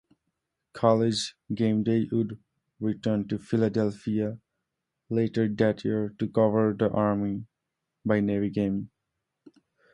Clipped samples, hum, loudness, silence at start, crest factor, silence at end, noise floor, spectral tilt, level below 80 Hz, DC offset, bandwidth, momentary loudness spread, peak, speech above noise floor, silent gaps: under 0.1%; none; -27 LUFS; 0.75 s; 20 dB; 1.05 s; -84 dBFS; -7 dB/octave; -60 dBFS; under 0.1%; 11 kHz; 10 LU; -6 dBFS; 58 dB; none